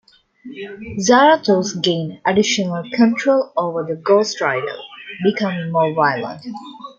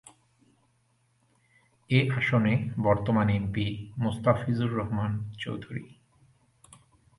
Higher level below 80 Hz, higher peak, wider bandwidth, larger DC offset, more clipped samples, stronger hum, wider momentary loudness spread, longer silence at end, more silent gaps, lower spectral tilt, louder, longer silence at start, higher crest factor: second, -60 dBFS vs -52 dBFS; first, -2 dBFS vs -8 dBFS; second, 7.6 kHz vs 11.5 kHz; neither; neither; neither; first, 19 LU vs 11 LU; second, 0.05 s vs 1.35 s; neither; second, -4.5 dB/octave vs -8 dB/octave; first, -17 LUFS vs -28 LUFS; second, 0.45 s vs 1.9 s; about the same, 16 dB vs 20 dB